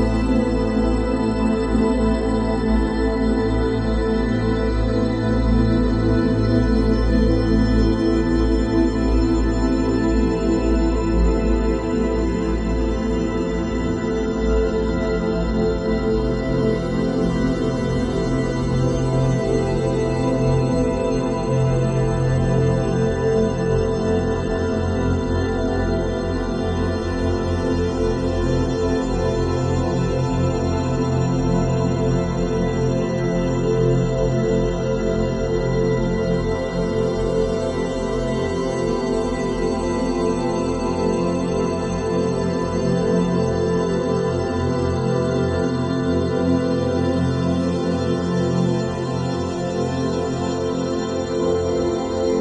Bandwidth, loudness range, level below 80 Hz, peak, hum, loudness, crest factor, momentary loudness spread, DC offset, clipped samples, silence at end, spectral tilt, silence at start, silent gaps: 9.8 kHz; 3 LU; -28 dBFS; -6 dBFS; none; -21 LUFS; 14 dB; 4 LU; under 0.1%; under 0.1%; 0 s; -7.5 dB/octave; 0 s; none